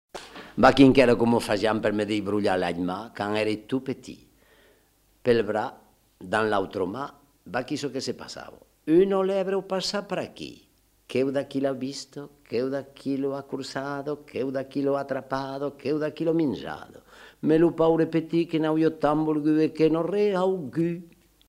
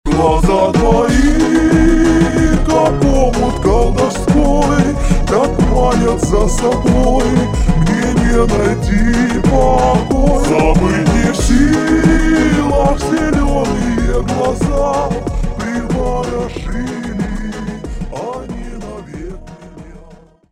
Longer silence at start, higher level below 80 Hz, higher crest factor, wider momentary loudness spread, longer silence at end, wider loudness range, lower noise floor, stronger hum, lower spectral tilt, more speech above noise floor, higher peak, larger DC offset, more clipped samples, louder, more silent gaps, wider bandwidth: about the same, 0.15 s vs 0.05 s; second, -54 dBFS vs -18 dBFS; first, 24 dB vs 12 dB; first, 15 LU vs 12 LU; about the same, 0.45 s vs 0.35 s; about the same, 7 LU vs 9 LU; first, -63 dBFS vs -41 dBFS; neither; about the same, -6 dB/octave vs -6.5 dB/octave; first, 38 dB vs 29 dB; about the same, -2 dBFS vs 0 dBFS; neither; neither; second, -25 LUFS vs -13 LUFS; neither; first, 15 kHz vs 12.5 kHz